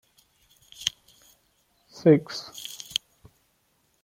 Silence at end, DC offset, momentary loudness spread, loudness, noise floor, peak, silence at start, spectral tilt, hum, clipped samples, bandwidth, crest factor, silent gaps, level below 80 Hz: 1.35 s; under 0.1%; 16 LU; -26 LUFS; -69 dBFS; -4 dBFS; 0.8 s; -5 dB/octave; none; under 0.1%; 16.5 kHz; 26 dB; none; -68 dBFS